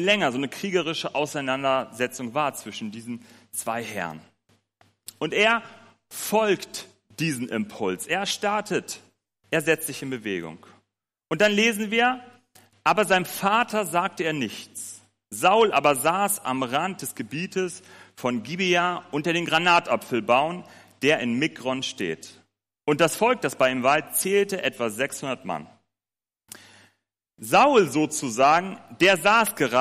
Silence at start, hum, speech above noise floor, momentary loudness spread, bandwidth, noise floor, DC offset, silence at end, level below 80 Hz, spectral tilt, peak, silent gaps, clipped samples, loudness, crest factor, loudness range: 0 s; none; over 66 dB; 15 LU; 15.5 kHz; under -90 dBFS; under 0.1%; 0 s; -68 dBFS; -3.5 dB/octave; -6 dBFS; none; under 0.1%; -23 LUFS; 18 dB; 5 LU